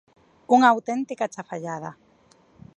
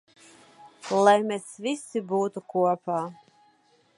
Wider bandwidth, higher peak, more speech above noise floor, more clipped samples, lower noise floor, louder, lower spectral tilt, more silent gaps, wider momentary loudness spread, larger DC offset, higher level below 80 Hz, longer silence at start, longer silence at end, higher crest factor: second, 8.6 kHz vs 11.5 kHz; about the same, -4 dBFS vs -6 dBFS; about the same, 36 dB vs 38 dB; neither; second, -58 dBFS vs -63 dBFS; first, -22 LUFS vs -26 LUFS; about the same, -5 dB/octave vs -5 dB/octave; neither; first, 17 LU vs 12 LU; neither; first, -70 dBFS vs -80 dBFS; second, 0.5 s vs 0.65 s; about the same, 0.85 s vs 0.85 s; about the same, 22 dB vs 22 dB